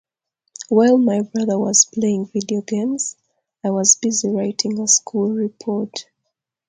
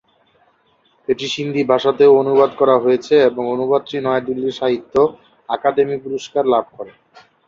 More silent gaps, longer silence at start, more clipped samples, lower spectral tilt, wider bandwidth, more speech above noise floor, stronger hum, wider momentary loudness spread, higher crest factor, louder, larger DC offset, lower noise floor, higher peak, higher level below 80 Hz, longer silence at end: neither; second, 0.6 s vs 1.1 s; neither; second, -3.5 dB/octave vs -5.5 dB/octave; first, 9.8 kHz vs 7.4 kHz; first, 59 dB vs 43 dB; neither; about the same, 11 LU vs 10 LU; about the same, 20 dB vs 16 dB; about the same, -18 LUFS vs -16 LUFS; neither; first, -77 dBFS vs -59 dBFS; about the same, 0 dBFS vs -2 dBFS; second, -66 dBFS vs -60 dBFS; about the same, 0.65 s vs 0.6 s